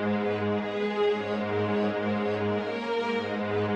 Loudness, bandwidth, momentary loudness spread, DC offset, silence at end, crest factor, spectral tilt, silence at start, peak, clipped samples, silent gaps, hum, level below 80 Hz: -28 LUFS; 7.8 kHz; 3 LU; under 0.1%; 0 s; 12 dB; -7 dB/octave; 0 s; -16 dBFS; under 0.1%; none; none; -68 dBFS